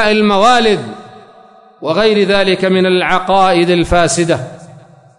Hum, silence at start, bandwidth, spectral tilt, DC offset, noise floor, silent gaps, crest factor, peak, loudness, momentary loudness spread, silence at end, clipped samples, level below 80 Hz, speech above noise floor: none; 0 s; 11 kHz; -4.5 dB/octave; under 0.1%; -42 dBFS; none; 12 dB; -2 dBFS; -11 LUFS; 10 LU; 0 s; under 0.1%; -34 dBFS; 31 dB